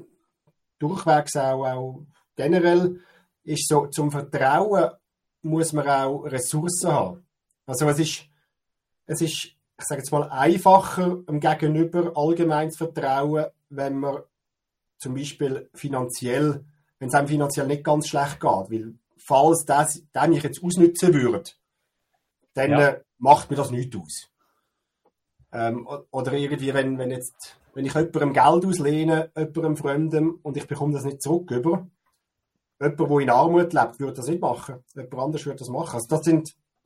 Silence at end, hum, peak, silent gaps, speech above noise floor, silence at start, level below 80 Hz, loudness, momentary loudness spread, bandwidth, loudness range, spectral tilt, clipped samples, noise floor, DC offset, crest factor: 0.35 s; none; -2 dBFS; none; 60 dB; 0.8 s; -62 dBFS; -23 LUFS; 14 LU; 16 kHz; 7 LU; -5.5 dB/octave; under 0.1%; -83 dBFS; under 0.1%; 22 dB